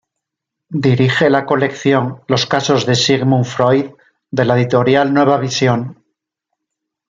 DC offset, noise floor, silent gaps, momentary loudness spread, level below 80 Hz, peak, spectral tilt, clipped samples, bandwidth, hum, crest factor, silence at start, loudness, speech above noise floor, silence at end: under 0.1%; -81 dBFS; none; 5 LU; -54 dBFS; -2 dBFS; -5.5 dB/octave; under 0.1%; 7.6 kHz; none; 14 dB; 0.7 s; -14 LUFS; 67 dB; 1.15 s